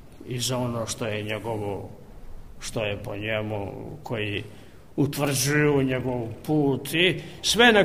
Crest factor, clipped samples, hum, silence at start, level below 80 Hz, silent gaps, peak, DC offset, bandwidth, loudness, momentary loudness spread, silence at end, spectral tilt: 20 dB; under 0.1%; none; 0 s; -48 dBFS; none; -4 dBFS; 0.4%; 15.5 kHz; -25 LUFS; 14 LU; 0 s; -4 dB/octave